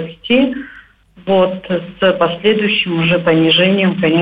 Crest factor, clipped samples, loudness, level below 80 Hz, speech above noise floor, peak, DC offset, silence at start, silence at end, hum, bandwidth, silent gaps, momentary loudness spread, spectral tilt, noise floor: 12 dB; under 0.1%; -13 LUFS; -48 dBFS; 28 dB; -2 dBFS; under 0.1%; 0 s; 0 s; none; 5 kHz; none; 11 LU; -8.5 dB/octave; -42 dBFS